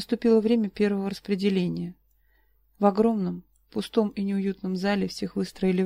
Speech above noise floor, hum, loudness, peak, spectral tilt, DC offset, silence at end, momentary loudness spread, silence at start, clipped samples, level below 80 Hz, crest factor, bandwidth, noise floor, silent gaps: 40 dB; none; -26 LUFS; -8 dBFS; -7 dB/octave; under 0.1%; 0 s; 11 LU; 0 s; under 0.1%; -58 dBFS; 18 dB; 15 kHz; -65 dBFS; none